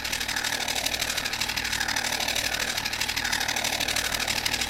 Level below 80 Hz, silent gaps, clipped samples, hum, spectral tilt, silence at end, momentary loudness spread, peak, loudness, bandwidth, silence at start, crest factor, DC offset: -48 dBFS; none; under 0.1%; none; -0.5 dB/octave; 0 s; 2 LU; -8 dBFS; -25 LUFS; 17 kHz; 0 s; 20 dB; under 0.1%